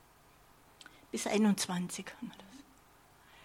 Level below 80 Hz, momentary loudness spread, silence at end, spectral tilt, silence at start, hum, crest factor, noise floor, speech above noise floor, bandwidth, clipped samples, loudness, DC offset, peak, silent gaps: -72 dBFS; 26 LU; 0.85 s; -4.5 dB/octave; 1.15 s; none; 20 dB; -62 dBFS; 29 dB; 16 kHz; under 0.1%; -34 LUFS; under 0.1%; -18 dBFS; none